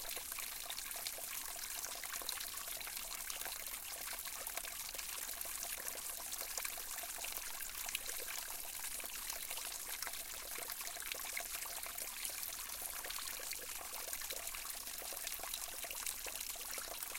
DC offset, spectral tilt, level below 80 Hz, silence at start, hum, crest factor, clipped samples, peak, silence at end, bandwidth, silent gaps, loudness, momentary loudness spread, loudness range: under 0.1%; 1 dB/octave; -64 dBFS; 0 s; none; 26 dB; under 0.1%; -20 dBFS; 0 s; 17 kHz; none; -42 LUFS; 2 LU; 1 LU